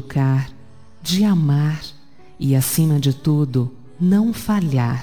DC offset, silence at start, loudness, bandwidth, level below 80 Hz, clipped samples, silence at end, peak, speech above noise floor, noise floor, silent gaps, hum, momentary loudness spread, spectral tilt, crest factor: 1%; 0 s; -19 LUFS; 19 kHz; -48 dBFS; under 0.1%; 0 s; -6 dBFS; 27 dB; -44 dBFS; none; none; 11 LU; -6.5 dB/octave; 12 dB